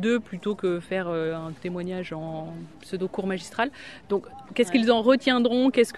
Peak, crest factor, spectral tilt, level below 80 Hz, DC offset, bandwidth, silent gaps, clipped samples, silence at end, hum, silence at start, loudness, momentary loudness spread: -8 dBFS; 18 dB; -5.5 dB/octave; -60 dBFS; 0.2%; 12.5 kHz; none; under 0.1%; 0 s; none; 0 s; -26 LUFS; 14 LU